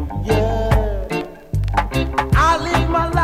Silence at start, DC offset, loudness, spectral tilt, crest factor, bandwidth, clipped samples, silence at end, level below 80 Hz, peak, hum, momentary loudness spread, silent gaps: 0 s; under 0.1%; -19 LUFS; -6 dB/octave; 12 dB; 15 kHz; under 0.1%; 0 s; -24 dBFS; -6 dBFS; none; 9 LU; none